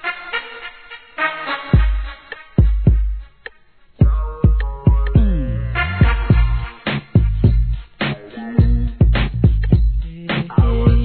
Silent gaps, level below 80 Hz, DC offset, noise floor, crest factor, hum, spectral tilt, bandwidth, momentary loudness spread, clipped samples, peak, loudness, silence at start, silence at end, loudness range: none; -18 dBFS; 0.3%; -51 dBFS; 16 dB; none; -11 dB/octave; 4.5 kHz; 15 LU; under 0.1%; 0 dBFS; -18 LUFS; 0 s; 0 s; 3 LU